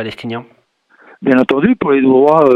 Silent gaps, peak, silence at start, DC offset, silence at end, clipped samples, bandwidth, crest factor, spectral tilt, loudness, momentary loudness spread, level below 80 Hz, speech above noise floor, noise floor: none; 0 dBFS; 0 s; under 0.1%; 0 s; under 0.1%; 5.6 kHz; 12 dB; -8 dB/octave; -12 LUFS; 16 LU; -52 dBFS; 38 dB; -49 dBFS